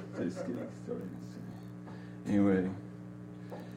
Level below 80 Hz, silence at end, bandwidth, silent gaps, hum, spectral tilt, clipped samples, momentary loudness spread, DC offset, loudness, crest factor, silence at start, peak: -66 dBFS; 0 s; 10.5 kHz; none; 60 Hz at -50 dBFS; -8 dB/octave; under 0.1%; 18 LU; under 0.1%; -36 LUFS; 18 dB; 0 s; -18 dBFS